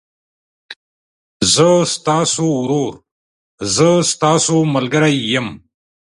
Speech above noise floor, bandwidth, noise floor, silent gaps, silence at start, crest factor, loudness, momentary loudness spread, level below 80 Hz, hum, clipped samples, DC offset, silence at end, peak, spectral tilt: over 76 dB; 11.5 kHz; under -90 dBFS; 0.76-1.40 s, 3.11-3.58 s; 0.7 s; 16 dB; -14 LUFS; 8 LU; -52 dBFS; none; under 0.1%; under 0.1%; 0.55 s; 0 dBFS; -4 dB/octave